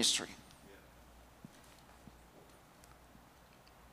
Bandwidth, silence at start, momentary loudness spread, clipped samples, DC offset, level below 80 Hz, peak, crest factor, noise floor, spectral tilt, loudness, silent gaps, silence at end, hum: 15.5 kHz; 0 s; 15 LU; under 0.1%; under 0.1%; -66 dBFS; -20 dBFS; 26 dB; -62 dBFS; -0.5 dB/octave; -36 LUFS; none; 1.55 s; none